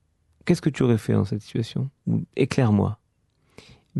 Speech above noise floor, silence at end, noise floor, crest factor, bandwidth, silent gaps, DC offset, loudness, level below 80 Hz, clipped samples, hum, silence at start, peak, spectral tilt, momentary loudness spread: 44 dB; 0 s; -67 dBFS; 18 dB; 12 kHz; none; under 0.1%; -24 LUFS; -56 dBFS; under 0.1%; none; 0.45 s; -6 dBFS; -7.5 dB/octave; 9 LU